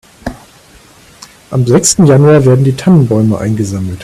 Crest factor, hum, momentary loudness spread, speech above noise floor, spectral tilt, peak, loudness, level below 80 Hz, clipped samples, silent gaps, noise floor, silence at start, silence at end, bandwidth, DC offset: 10 dB; none; 15 LU; 32 dB; -6 dB/octave; 0 dBFS; -9 LUFS; -40 dBFS; 0.6%; none; -40 dBFS; 0.25 s; 0 s; 13.5 kHz; under 0.1%